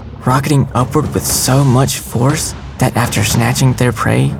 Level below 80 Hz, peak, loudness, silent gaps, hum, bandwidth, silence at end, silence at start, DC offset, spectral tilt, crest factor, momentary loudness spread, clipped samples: -32 dBFS; 0 dBFS; -13 LUFS; none; none; 17 kHz; 0 s; 0 s; under 0.1%; -5 dB/octave; 12 dB; 5 LU; under 0.1%